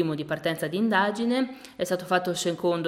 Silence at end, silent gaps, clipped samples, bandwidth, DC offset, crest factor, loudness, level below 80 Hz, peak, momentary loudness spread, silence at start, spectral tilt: 0 s; none; under 0.1%; 16.5 kHz; under 0.1%; 18 dB; -26 LUFS; -68 dBFS; -8 dBFS; 6 LU; 0 s; -4.5 dB/octave